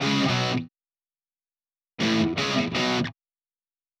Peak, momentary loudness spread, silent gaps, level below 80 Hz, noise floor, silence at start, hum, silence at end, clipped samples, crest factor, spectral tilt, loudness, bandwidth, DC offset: -12 dBFS; 8 LU; none; -58 dBFS; under -90 dBFS; 0 s; none; 0.9 s; under 0.1%; 16 dB; -4.5 dB/octave; -25 LUFS; 13 kHz; under 0.1%